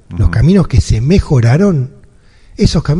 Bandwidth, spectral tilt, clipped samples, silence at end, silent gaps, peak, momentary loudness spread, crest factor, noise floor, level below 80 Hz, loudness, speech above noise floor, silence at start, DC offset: 11 kHz; -7.5 dB/octave; 0.2%; 0 s; none; 0 dBFS; 6 LU; 10 dB; -42 dBFS; -20 dBFS; -11 LUFS; 32 dB; 0.1 s; under 0.1%